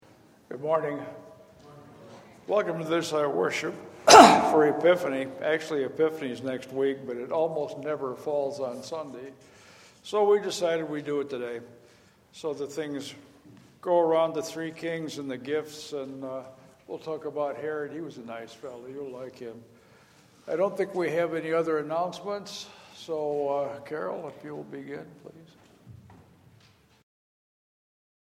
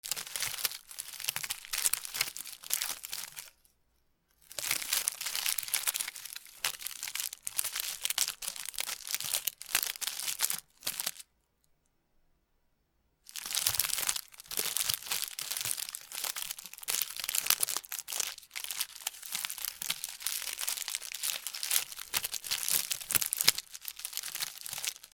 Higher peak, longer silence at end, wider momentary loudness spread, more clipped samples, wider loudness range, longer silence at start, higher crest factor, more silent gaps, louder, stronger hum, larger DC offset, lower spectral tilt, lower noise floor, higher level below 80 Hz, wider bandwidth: about the same, 0 dBFS vs 0 dBFS; first, 2.15 s vs 0.05 s; first, 17 LU vs 9 LU; neither; first, 16 LU vs 4 LU; first, 0.5 s vs 0.05 s; second, 28 dB vs 36 dB; neither; first, -26 LUFS vs -33 LUFS; neither; neither; first, -3.5 dB/octave vs 2 dB/octave; second, -59 dBFS vs -75 dBFS; about the same, -70 dBFS vs -70 dBFS; second, 16 kHz vs over 20 kHz